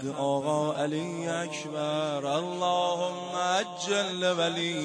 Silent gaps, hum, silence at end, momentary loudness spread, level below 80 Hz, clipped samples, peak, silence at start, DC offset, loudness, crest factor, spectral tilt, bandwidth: none; none; 0 s; 5 LU; -76 dBFS; under 0.1%; -14 dBFS; 0 s; under 0.1%; -29 LUFS; 14 dB; -4 dB/octave; 10.5 kHz